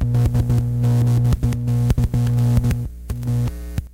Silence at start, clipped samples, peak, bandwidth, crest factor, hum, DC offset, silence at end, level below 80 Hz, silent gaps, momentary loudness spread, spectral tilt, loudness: 0 s; under 0.1%; -4 dBFS; 15.5 kHz; 14 dB; 60 Hz at -20 dBFS; under 0.1%; 0.05 s; -26 dBFS; none; 8 LU; -8 dB/octave; -19 LUFS